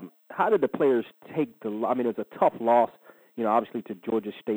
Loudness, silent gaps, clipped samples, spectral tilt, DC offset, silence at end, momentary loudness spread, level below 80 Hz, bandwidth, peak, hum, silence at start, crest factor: -26 LUFS; none; under 0.1%; -8 dB/octave; under 0.1%; 0 s; 12 LU; -84 dBFS; over 20 kHz; -8 dBFS; none; 0 s; 18 dB